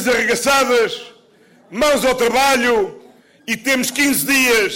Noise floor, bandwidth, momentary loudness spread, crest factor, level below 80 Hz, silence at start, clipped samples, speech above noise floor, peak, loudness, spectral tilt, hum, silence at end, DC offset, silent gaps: -50 dBFS; 16.5 kHz; 11 LU; 10 dB; -48 dBFS; 0 s; under 0.1%; 35 dB; -8 dBFS; -15 LUFS; -2 dB/octave; none; 0 s; under 0.1%; none